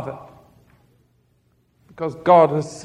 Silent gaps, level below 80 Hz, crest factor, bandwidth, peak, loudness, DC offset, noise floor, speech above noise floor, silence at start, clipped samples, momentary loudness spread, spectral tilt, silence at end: none; -60 dBFS; 20 dB; 10.5 kHz; -2 dBFS; -17 LUFS; under 0.1%; -63 dBFS; 45 dB; 0 s; under 0.1%; 20 LU; -6.5 dB/octave; 0 s